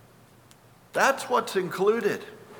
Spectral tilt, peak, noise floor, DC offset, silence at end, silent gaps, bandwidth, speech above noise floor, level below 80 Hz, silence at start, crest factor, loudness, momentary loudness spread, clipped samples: -4 dB/octave; -8 dBFS; -55 dBFS; under 0.1%; 0 s; none; 20 kHz; 30 dB; -70 dBFS; 0.95 s; 20 dB; -26 LUFS; 8 LU; under 0.1%